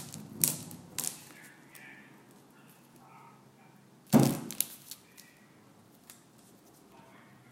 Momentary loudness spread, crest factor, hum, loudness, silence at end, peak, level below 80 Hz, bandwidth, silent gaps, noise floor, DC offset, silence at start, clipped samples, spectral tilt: 29 LU; 34 dB; none; -31 LUFS; 1.4 s; -2 dBFS; -72 dBFS; 16.5 kHz; none; -59 dBFS; under 0.1%; 0 s; under 0.1%; -4.5 dB/octave